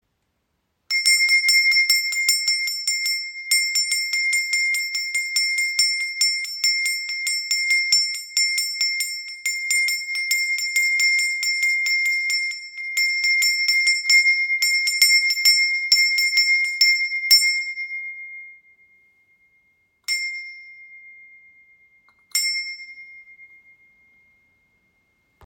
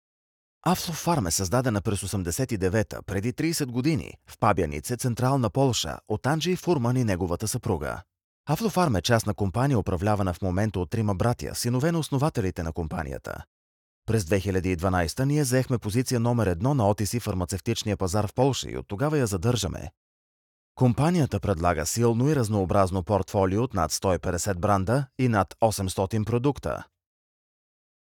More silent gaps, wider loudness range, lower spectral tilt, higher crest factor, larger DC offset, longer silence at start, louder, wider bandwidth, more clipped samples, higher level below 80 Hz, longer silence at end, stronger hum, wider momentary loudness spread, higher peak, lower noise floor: second, none vs 8.24-8.44 s, 13.47-14.02 s, 19.97-20.75 s; first, 14 LU vs 3 LU; second, 7 dB/octave vs -5.5 dB/octave; about the same, 20 dB vs 18 dB; neither; first, 0.9 s vs 0.65 s; first, -18 LUFS vs -26 LUFS; about the same, 17 kHz vs 18.5 kHz; neither; second, -82 dBFS vs -46 dBFS; first, 2 s vs 1.35 s; neither; first, 11 LU vs 7 LU; first, -2 dBFS vs -8 dBFS; second, -73 dBFS vs under -90 dBFS